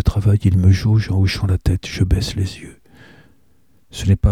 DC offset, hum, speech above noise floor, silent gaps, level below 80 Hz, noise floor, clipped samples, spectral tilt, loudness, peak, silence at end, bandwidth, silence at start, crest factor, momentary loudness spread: 0.3%; none; 43 dB; none; -28 dBFS; -59 dBFS; under 0.1%; -6.5 dB/octave; -18 LUFS; -2 dBFS; 0 s; 12.5 kHz; 0.05 s; 16 dB; 10 LU